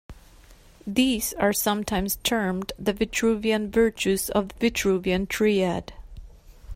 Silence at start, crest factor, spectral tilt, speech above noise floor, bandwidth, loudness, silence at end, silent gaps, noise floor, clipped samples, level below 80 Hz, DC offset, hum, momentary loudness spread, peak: 0.1 s; 16 dB; -4 dB/octave; 27 dB; 16 kHz; -24 LUFS; 0 s; none; -51 dBFS; under 0.1%; -44 dBFS; under 0.1%; none; 6 LU; -8 dBFS